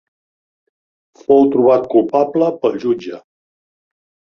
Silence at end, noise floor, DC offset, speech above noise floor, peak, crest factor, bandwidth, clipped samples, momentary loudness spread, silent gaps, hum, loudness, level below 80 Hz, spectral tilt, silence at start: 1.15 s; under -90 dBFS; under 0.1%; over 76 dB; -2 dBFS; 16 dB; 6.8 kHz; under 0.1%; 10 LU; none; none; -14 LUFS; -58 dBFS; -8 dB/octave; 1.3 s